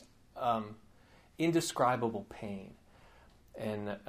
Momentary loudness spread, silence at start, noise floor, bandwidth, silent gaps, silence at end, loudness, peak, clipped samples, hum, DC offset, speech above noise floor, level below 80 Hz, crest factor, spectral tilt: 19 LU; 0 s; -62 dBFS; 15.5 kHz; none; 0 s; -35 LUFS; -16 dBFS; under 0.1%; none; under 0.1%; 27 dB; -66 dBFS; 22 dB; -5 dB/octave